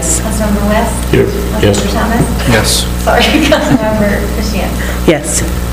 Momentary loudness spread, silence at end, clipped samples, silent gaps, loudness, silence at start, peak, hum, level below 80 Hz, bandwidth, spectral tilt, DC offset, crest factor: 5 LU; 0 s; 0.3%; none; -11 LUFS; 0 s; 0 dBFS; 60 Hz at -15 dBFS; -18 dBFS; 16.5 kHz; -4.5 dB/octave; 0.3%; 10 dB